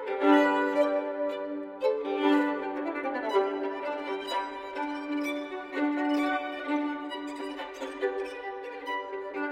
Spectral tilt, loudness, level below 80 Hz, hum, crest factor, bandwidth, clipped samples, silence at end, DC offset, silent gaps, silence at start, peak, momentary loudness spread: -4 dB/octave; -30 LUFS; -70 dBFS; none; 20 dB; 12.5 kHz; under 0.1%; 0 s; under 0.1%; none; 0 s; -10 dBFS; 11 LU